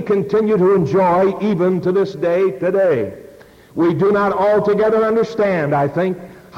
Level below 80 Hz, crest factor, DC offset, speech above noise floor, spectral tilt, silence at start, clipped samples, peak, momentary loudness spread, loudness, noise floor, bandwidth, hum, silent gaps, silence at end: -52 dBFS; 10 dB; under 0.1%; 27 dB; -8.5 dB/octave; 0 s; under 0.1%; -6 dBFS; 5 LU; -16 LUFS; -42 dBFS; 7.6 kHz; none; none; 0 s